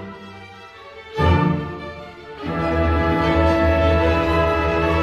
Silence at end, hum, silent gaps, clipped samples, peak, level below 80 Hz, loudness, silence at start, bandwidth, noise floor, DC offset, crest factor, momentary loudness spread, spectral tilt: 0 s; none; none; under 0.1%; -4 dBFS; -28 dBFS; -19 LUFS; 0 s; 7.8 kHz; -40 dBFS; under 0.1%; 16 dB; 21 LU; -7.5 dB/octave